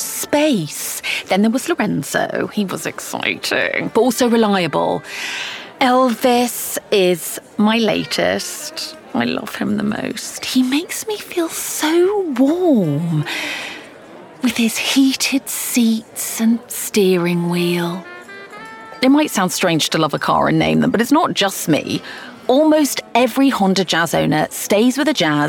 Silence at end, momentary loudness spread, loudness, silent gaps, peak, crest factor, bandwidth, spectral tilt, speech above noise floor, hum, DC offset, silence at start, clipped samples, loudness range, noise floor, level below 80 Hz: 0 s; 10 LU; -17 LUFS; none; -2 dBFS; 16 dB; 19 kHz; -4 dB/octave; 22 dB; none; under 0.1%; 0 s; under 0.1%; 3 LU; -38 dBFS; -58 dBFS